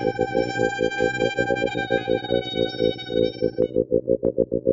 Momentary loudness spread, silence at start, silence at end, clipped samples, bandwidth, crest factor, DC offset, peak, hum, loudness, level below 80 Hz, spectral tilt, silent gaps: 2 LU; 0 s; 0 s; under 0.1%; 7.6 kHz; 18 dB; under 0.1%; -4 dBFS; none; -23 LUFS; -46 dBFS; -6 dB/octave; none